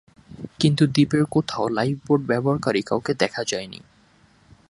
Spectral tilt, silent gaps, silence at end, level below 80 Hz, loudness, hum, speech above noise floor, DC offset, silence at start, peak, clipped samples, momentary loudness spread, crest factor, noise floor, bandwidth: -6 dB/octave; none; 0.95 s; -56 dBFS; -22 LUFS; none; 35 dB; under 0.1%; 0.3 s; -2 dBFS; under 0.1%; 15 LU; 20 dB; -57 dBFS; 11.5 kHz